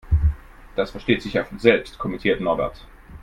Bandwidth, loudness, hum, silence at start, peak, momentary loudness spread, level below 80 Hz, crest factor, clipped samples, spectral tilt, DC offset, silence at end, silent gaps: 10.5 kHz; -23 LUFS; none; 0.05 s; 0 dBFS; 11 LU; -30 dBFS; 22 dB; under 0.1%; -7.5 dB/octave; under 0.1%; 0.05 s; none